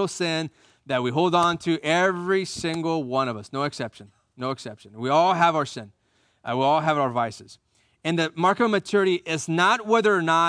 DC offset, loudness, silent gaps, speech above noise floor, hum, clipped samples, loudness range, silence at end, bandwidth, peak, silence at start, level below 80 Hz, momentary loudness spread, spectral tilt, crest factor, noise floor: under 0.1%; -23 LUFS; none; 39 dB; none; under 0.1%; 3 LU; 0 s; 10.5 kHz; -6 dBFS; 0 s; -66 dBFS; 12 LU; -5 dB/octave; 18 dB; -62 dBFS